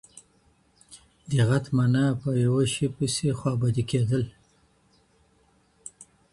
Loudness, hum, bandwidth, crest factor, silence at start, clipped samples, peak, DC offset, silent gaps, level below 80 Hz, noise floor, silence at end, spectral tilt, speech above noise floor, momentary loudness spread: -25 LUFS; none; 11.5 kHz; 18 dB; 0.15 s; under 0.1%; -10 dBFS; under 0.1%; none; -56 dBFS; -64 dBFS; 0.3 s; -6 dB/octave; 40 dB; 21 LU